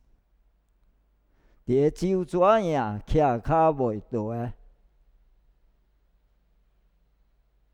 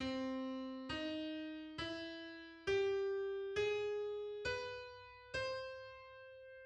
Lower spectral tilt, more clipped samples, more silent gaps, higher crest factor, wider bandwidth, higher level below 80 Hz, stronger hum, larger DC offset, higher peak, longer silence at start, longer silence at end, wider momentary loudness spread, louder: first, -8 dB/octave vs -4.5 dB/octave; neither; neither; about the same, 20 dB vs 16 dB; first, 11.5 kHz vs 9.2 kHz; first, -44 dBFS vs -68 dBFS; neither; neither; first, -8 dBFS vs -28 dBFS; first, 1.7 s vs 0 s; first, 3.2 s vs 0 s; second, 11 LU vs 15 LU; first, -25 LUFS vs -42 LUFS